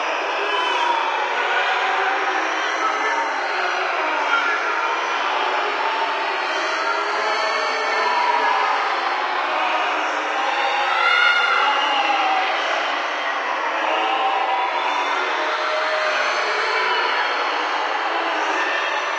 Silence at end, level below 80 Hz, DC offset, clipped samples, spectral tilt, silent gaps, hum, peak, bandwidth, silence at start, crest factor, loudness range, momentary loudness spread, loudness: 0 s; -82 dBFS; under 0.1%; under 0.1%; 1 dB/octave; none; none; -4 dBFS; 9.6 kHz; 0 s; 16 dB; 2 LU; 3 LU; -20 LUFS